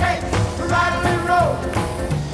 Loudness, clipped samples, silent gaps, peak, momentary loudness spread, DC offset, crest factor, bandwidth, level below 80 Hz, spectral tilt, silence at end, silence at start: -20 LUFS; under 0.1%; none; -6 dBFS; 6 LU; under 0.1%; 12 dB; 11 kHz; -32 dBFS; -5.5 dB/octave; 0 s; 0 s